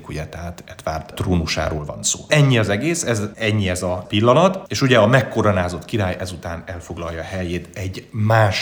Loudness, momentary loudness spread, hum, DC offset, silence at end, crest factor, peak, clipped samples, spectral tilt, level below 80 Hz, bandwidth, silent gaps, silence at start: -19 LUFS; 15 LU; none; under 0.1%; 0 s; 18 dB; 0 dBFS; under 0.1%; -5 dB/octave; -44 dBFS; over 20 kHz; none; 0 s